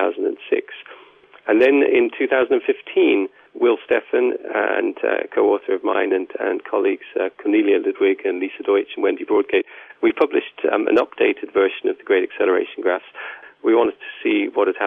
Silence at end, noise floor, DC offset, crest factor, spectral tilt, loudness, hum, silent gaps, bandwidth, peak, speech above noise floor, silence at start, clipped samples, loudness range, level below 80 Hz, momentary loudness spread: 0 s; -48 dBFS; under 0.1%; 14 dB; -6.5 dB/octave; -19 LUFS; none; none; 3.9 kHz; -4 dBFS; 29 dB; 0 s; under 0.1%; 2 LU; -66 dBFS; 7 LU